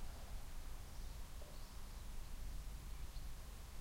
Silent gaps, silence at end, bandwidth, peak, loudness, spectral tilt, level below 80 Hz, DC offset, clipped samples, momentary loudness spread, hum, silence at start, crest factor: none; 0 s; 16 kHz; -36 dBFS; -55 LUFS; -4 dB/octave; -50 dBFS; under 0.1%; under 0.1%; 2 LU; none; 0 s; 12 dB